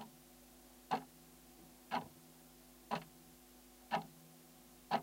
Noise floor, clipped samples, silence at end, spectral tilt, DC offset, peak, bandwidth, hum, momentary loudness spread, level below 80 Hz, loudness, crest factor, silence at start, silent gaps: -62 dBFS; under 0.1%; 0 s; -4 dB/octave; under 0.1%; -22 dBFS; 16.5 kHz; none; 17 LU; -74 dBFS; -45 LUFS; 24 dB; 0 s; none